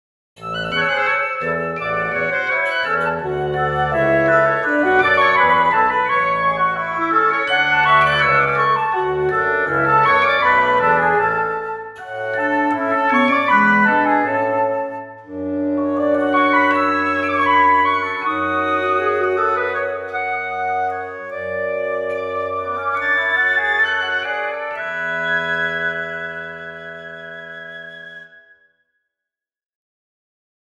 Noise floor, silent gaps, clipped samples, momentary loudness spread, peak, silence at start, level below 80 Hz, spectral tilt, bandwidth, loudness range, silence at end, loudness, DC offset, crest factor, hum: -86 dBFS; none; under 0.1%; 14 LU; -2 dBFS; 0.4 s; -50 dBFS; -6 dB/octave; 12 kHz; 8 LU; 2.5 s; -17 LUFS; under 0.1%; 18 dB; none